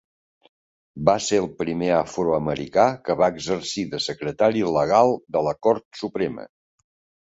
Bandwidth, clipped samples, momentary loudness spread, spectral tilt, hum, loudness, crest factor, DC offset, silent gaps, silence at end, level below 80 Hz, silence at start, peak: 8 kHz; under 0.1%; 8 LU; -5 dB/octave; none; -22 LUFS; 20 dB; under 0.1%; 5.85-5.91 s; 0.75 s; -54 dBFS; 0.95 s; -2 dBFS